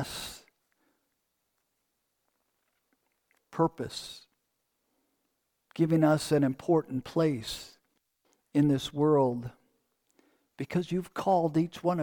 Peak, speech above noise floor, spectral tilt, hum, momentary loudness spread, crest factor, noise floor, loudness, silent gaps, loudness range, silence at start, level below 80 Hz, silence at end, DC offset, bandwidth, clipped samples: -12 dBFS; 52 dB; -6.5 dB/octave; none; 17 LU; 18 dB; -80 dBFS; -29 LUFS; none; 9 LU; 0 s; -64 dBFS; 0 s; under 0.1%; 18.5 kHz; under 0.1%